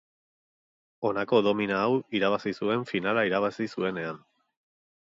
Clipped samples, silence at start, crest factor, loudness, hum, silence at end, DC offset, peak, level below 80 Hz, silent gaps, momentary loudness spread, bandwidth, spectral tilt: under 0.1%; 1 s; 18 dB; -27 LUFS; none; 0.9 s; under 0.1%; -10 dBFS; -68 dBFS; none; 8 LU; 7.8 kHz; -6.5 dB/octave